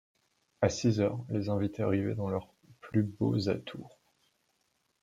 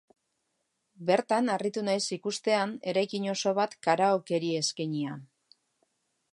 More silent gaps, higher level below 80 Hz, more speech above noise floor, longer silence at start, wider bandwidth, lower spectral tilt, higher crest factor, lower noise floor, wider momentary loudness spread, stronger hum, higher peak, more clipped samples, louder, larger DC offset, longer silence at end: neither; first, -64 dBFS vs -82 dBFS; second, 46 dB vs 50 dB; second, 0.6 s vs 1 s; second, 7.8 kHz vs 11.5 kHz; first, -7 dB/octave vs -4 dB/octave; about the same, 22 dB vs 20 dB; about the same, -76 dBFS vs -79 dBFS; about the same, 8 LU vs 7 LU; neither; about the same, -12 dBFS vs -10 dBFS; neither; second, -32 LUFS vs -29 LUFS; neither; about the same, 1.15 s vs 1.05 s